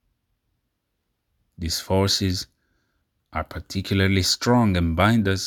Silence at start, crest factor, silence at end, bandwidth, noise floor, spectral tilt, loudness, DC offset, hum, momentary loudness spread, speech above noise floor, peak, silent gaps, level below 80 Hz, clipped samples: 1.6 s; 22 dB; 0 s; 19 kHz; -76 dBFS; -5 dB/octave; -22 LUFS; under 0.1%; none; 13 LU; 55 dB; -2 dBFS; none; -46 dBFS; under 0.1%